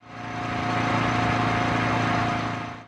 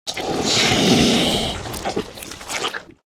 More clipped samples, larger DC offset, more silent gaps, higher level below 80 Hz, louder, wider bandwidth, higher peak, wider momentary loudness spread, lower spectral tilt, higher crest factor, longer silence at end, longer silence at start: neither; neither; neither; second, -46 dBFS vs -40 dBFS; second, -24 LUFS vs -19 LUFS; second, 11 kHz vs 18.5 kHz; second, -10 dBFS vs -2 dBFS; second, 7 LU vs 13 LU; first, -6 dB/octave vs -3.5 dB/octave; second, 14 dB vs 20 dB; second, 0 s vs 0.25 s; about the same, 0.05 s vs 0.05 s